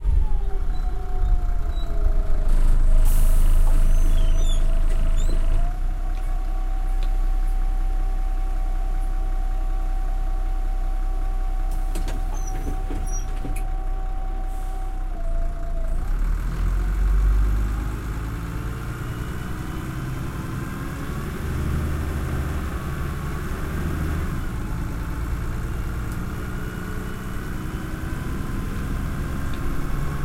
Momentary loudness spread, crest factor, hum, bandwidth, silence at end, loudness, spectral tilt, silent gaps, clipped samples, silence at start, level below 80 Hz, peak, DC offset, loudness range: 7 LU; 14 dB; none; 14.5 kHz; 0 s; -28 LUFS; -6 dB/octave; none; under 0.1%; 0 s; -22 dBFS; -8 dBFS; under 0.1%; 6 LU